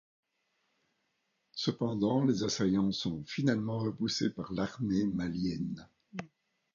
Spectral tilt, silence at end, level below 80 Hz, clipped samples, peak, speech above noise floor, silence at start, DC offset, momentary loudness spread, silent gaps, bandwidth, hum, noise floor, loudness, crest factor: -5.5 dB/octave; 0.5 s; -62 dBFS; under 0.1%; -16 dBFS; 48 dB; 1.55 s; under 0.1%; 16 LU; none; 7.4 kHz; none; -79 dBFS; -33 LUFS; 18 dB